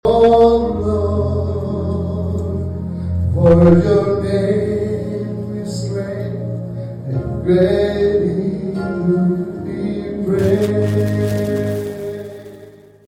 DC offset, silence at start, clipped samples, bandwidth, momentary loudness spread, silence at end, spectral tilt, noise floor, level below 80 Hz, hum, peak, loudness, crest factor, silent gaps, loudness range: under 0.1%; 0.05 s; under 0.1%; 15 kHz; 13 LU; 0.35 s; -8.5 dB/octave; -41 dBFS; -34 dBFS; none; -2 dBFS; -17 LUFS; 14 dB; none; 4 LU